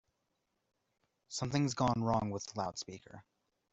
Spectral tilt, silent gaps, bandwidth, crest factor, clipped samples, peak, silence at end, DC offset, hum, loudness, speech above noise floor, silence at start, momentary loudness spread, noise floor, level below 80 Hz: -5.5 dB/octave; none; 8.2 kHz; 20 dB; under 0.1%; -18 dBFS; 0.5 s; under 0.1%; none; -36 LUFS; 47 dB; 1.3 s; 13 LU; -83 dBFS; -64 dBFS